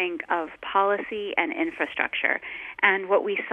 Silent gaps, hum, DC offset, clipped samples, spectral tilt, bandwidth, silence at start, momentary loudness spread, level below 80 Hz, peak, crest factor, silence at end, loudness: none; none; under 0.1%; under 0.1%; -5.5 dB/octave; 4 kHz; 0 s; 7 LU; -66 dBFS; -6 dBFS; 20 dB; 0 s; -25 LUFS